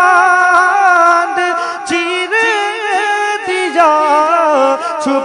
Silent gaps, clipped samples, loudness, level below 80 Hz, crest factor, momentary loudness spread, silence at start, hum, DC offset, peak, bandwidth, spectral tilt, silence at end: none; 0.2%; -11 LUFS; -62 dBFS; 12 dB; 7 LU; 0 s; none; under 0.1%; 0 dBFS; 11 kHz; -1.5 dB/octave; 0 s